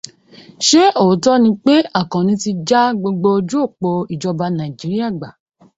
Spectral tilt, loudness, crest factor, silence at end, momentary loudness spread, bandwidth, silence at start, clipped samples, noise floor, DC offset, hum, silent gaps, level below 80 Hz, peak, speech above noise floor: -5 dB/octave; -15 LUFS; 16 dB; 0.5 s; 10 LU; 8 kHz; 0.6 s; under 0.1%; -43 dBFS; under 0.1%; none; none; -56 dBFS; 0 dBFS; 28 dB